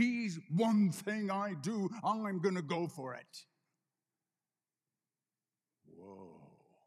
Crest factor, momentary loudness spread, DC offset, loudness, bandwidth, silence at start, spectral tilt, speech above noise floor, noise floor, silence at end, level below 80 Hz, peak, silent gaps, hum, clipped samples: 18 dB; 22 LU; under 0.1%; -36 LUFS; 14 kHz; 0 s; -6.5 dB/octave; over 54 dB; under -90 dBFS; 0.4 s; under -90 dBFS; -20 dBFS; none; none; under 0.1%